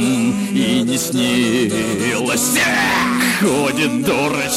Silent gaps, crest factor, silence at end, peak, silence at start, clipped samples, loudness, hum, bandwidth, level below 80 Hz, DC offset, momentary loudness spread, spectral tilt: none; 12 dB; 0 s; -4 dBFS; 0 s; under 0.1%; -16 LUFS; none; 16 kHz; -48 dBFS; under 0.1%; 4 LU; -3.5 dB/octave